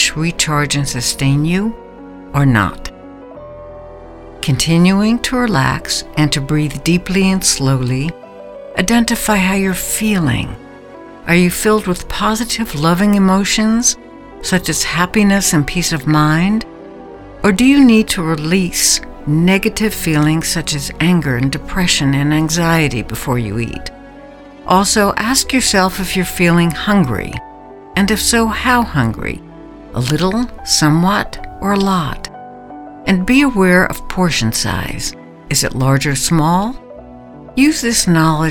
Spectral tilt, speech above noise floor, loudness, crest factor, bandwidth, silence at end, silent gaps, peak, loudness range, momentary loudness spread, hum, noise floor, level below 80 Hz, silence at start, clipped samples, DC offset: -4.5 dB/octave; 22 dB; -14 LUFS; 14 dB; 19 kHz; 0 s; none; 0 dBFS; 3 LU; 15 LU; none; -36 dBFS; -32 dBFS; 0 s; under 0.1%; under 0.1%